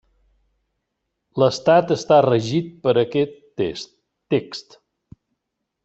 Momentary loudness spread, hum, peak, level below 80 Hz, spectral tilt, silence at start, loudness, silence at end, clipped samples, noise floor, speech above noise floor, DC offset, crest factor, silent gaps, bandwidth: 18 LU; none; -2 dBFS; -60 dBFS; -6 dB/octave; 1.35 s; -19 LUFS; 1.25 s; under 0.1%; -79 dBFS; 61 dB; under 0.1%; 20 dB; none; 8.2 kHz